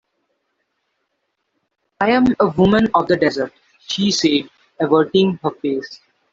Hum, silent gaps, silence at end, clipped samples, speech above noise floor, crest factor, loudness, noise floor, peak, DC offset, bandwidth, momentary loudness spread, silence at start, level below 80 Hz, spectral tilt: none; none; 0.4 s; under 0.1%; 56 dB; 18 dB; -17 LUFS; -72 dBFS; -2 dBFS; under 0.1%; 7.8 kHz; 11 LU; 2 s; -50 dBFS; -5 dB/octave